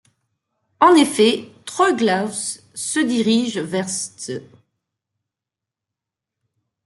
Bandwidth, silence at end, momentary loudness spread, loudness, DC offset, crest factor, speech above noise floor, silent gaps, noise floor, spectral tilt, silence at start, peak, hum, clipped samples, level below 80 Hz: 12 kHz; 2.4 s; 15 LU; -18 LUFS; under 0.1%; 20 dB; 68 dB; none; -86 dBFS; -3.5 dB/octave; 0.8 s; -2 dBFS; none; under 0.1%; -68 dBFS